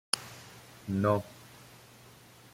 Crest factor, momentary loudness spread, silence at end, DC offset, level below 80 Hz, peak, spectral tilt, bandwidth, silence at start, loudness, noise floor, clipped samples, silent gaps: 30 dB; 25 LU; 0.9 s; under 0.1%; -68 dBFS; -6 dBFS; -4.5 dB/octave; 16.5 kHz; 0.15 s; -31 LUFS; -55 dBFS; under 0.1%; none